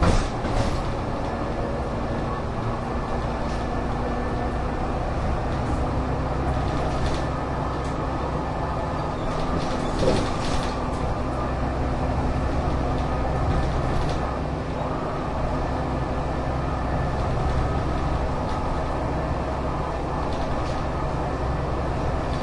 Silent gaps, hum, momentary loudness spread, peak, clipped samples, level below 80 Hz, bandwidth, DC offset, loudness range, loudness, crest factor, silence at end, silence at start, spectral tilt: none; none; 3 LU; -8 dBFS; under 0.1%; -30 dBFS; 11.5 kHz; under 0.1%; 2 LU; -26 LUFS; 16 dB; 0 s; 0 s; -7 dB/octave